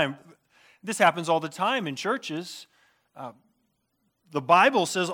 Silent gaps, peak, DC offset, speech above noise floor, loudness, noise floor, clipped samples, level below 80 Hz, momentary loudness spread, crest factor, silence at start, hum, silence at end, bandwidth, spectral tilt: none; -6 dBFS; under 0.1%; 49 dB; -24 LUFS; -74 dBFS; under 0.1%; -84 dBFS; 23 LU; 22 dB; 0 s; none; 0 s; 18 kHz; -3.5 dB/octave